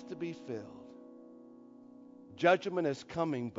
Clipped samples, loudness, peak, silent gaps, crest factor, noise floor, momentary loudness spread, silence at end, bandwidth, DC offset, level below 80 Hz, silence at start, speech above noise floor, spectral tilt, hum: under 0.1%; -34 LUFS; -14 dBFS; none; 22 dB; -55 dBFS; 26 LU; 0 s; 7.6 kHz; under 0.1%; -74 dBFS; 0 s; 21 dB; -4.5 dB/octave; none